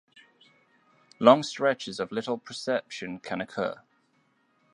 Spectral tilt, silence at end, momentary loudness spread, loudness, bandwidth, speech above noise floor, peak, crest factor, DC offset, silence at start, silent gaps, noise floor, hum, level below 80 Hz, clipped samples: -4.5 dB/octave; 1 s; 15 LU; -27 LUFS; 11 kHz; 42 dB; -2 dBFS; 28 dB; under 0.1%; 1.2 s; none; -69 dBFS; none; -72 dBFS; under 0.1%